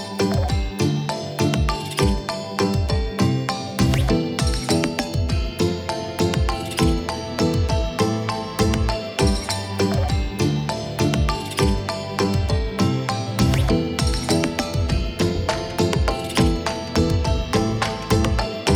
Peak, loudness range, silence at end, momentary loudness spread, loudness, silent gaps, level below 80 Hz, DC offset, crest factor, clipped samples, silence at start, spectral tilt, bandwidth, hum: -6 dBFS; 1 LU; 0 s; 4 LU; -22 LUFS; none; -28 dBFS; under 0.1%; 16 dB; under 0.1%; 0 s; -5.5 dB/octave; over 20 kHz; none